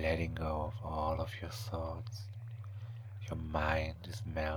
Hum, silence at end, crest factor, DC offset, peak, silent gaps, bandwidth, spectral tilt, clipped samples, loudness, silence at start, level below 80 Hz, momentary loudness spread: none; 0 s; 20 dB; under 0.1%; -18 dBFS; none; 19.5 kHz; -6.5 dB/octave; under 0.1%; -39 LUFS; 0 s; -46 dBFS; 12 LU